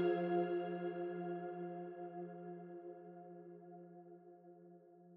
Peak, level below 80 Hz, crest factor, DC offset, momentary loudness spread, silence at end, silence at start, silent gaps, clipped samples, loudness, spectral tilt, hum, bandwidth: -26 dBFS; under -90 dBFS; 18 dB; under 0.1%; 23 LU; 0 s; 0 s; none; under 0.1%; -44 LUFS; -7 dB/octave; none; 4.2 kHz